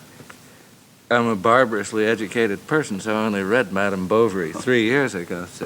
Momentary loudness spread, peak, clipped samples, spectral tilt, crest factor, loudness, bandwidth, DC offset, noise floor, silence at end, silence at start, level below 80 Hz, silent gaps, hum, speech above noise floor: 6 LU; -2 dBFS; under 0.1%; -5 dB/octave; 18 dB; -20 LUFS; over 20 kHz; under 0.1%; -50 dBFS; 0 s; 0 s; -66 dBFS; none; none; 29 dB